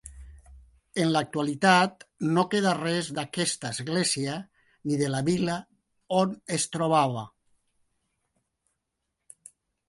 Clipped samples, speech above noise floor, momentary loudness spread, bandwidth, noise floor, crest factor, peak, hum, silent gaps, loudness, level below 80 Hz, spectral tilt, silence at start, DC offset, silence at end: under 0.1%; 56 dB; 12 LU; 11.5 kHz; -82 dBFS; 22 dB; -6 dBFS; none; none; -26 LUFS; -58 dBFS; -4.5 dB/octave; 0.05 s; under 0.1%; 2.6 s